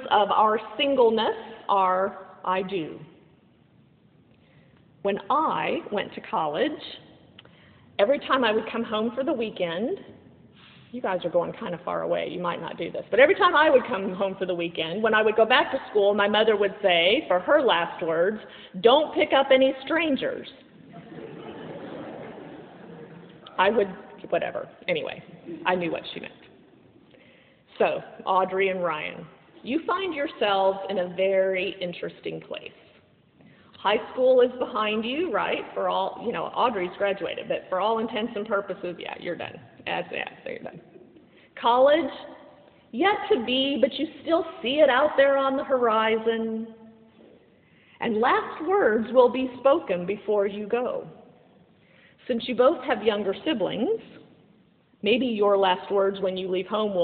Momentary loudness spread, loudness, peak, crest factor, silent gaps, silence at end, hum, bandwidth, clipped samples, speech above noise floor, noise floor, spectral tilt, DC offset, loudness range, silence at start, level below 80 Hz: 18 LU; -24 LUFS; -4 dBFS; 22 dB; none; 0 s; none; 4.6 kHz; under 0.1%; 36 dB; -60 dBFS; -2 dB/octave; under 0.1%; 8 LU; 0 s; -66 dBFS